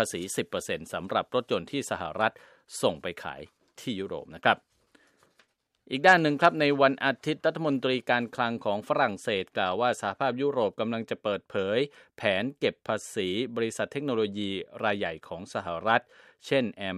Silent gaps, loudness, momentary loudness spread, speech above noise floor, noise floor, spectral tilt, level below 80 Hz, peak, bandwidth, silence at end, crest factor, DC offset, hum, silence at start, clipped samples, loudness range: none; -28 LUFS; 12 LU; 40 dB; -68 dBFS; -4.5 dB/octave; -68 dBFS; -4 dBFS; 15 kHz; 0 s; 24 dB; under 0.1%; none; 0 s; under 0.1%; 7 LU